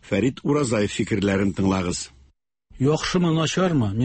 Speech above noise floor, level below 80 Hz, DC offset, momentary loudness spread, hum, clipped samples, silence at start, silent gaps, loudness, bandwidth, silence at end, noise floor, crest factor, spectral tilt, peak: 37 dB; -46 dBFS; under 0.1%; 4 LU; none; under 0.1%; 0.05 s; none; -22 LUFS; 8.8 kHz; 0 s; -59 dBFS; 14 dB; -5.5 dB/octave; -8 dBFS